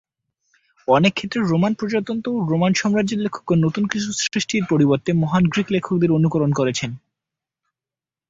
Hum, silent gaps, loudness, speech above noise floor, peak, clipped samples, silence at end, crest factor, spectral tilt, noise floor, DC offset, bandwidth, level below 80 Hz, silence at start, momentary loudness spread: none; none; -20 LUFS; 71 dB; -2 dBFS; under 0.1%; 1.35 s; 18 dB; -5.5 dB/octave; -90 dBFS; under 0.1%; 7.8 kHz; -54 dBFS; 0.9 s; 6 LU